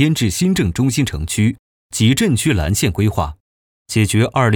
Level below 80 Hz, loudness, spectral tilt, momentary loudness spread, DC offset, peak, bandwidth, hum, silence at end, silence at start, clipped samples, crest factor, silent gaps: -34 dBFS; -17 LUFS; -5 dB/octave; 7 LU; under 0.1%; -2 dBFS; 19.5 kHz; none; 0 s; 0 s; under 0.1%; 14 dB; 1.59-1.90 s, 3.40-3.85 s